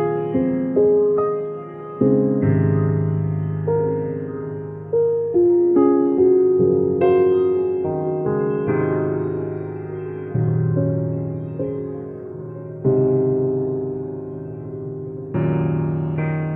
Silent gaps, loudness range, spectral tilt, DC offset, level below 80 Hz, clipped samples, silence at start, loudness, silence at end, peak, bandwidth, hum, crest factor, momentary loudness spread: none; 6 LU; -13.5 dB/octave; under 0.1%; -52 dBFS; under 0.1%; 0 s; -20 LUFS; 0 s; -4 dBFS; 3.4 kHz; none; 16 dB; 14 LU